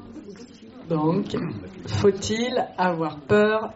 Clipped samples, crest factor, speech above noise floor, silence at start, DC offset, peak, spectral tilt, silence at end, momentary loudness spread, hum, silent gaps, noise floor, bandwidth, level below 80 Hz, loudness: under 0.1%; 16 dB; 20 dB; 0 s; under 0.1%; -8 dBFS; -5 dB/octave; 0 s; 22 LU; none; none; -43 dBFS; 8 kHz; -54 dBFS; -24 LUFS